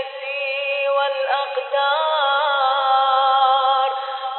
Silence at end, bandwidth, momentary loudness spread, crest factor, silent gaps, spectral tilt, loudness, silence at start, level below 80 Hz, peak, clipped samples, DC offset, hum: 0 s; 4.3 kHz; 7 LU; 14 dB; none; 0 dB/octave; -19 LUFS; 0 s; under -90 dBFS; -6 dBFS; under 0.1%; under 0.1%; none